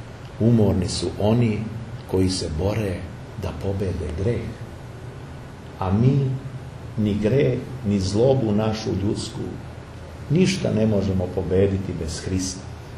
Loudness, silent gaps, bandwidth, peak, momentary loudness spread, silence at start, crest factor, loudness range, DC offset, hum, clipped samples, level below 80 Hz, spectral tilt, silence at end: -23 LUFS; none; 12.5 kHz; -4 dBFS; 18 LU; 0 s; 18 dB; 4 LU; under 0.1%; none; under 0.1%; -42 dBFS; -6.5 dB/octave; 0 s